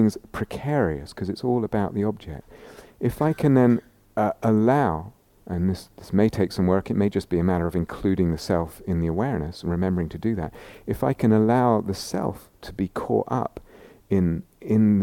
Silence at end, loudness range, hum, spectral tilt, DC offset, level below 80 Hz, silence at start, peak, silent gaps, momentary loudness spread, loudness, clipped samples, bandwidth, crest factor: 0 s; 3 LU; none; -8 dB/octave; under 0.1%; -44 dBFS; 0 s; -6 dBFS; none; 13 LU; -24 LUFS; under 0.1%; 16.5 kHz; 18 dB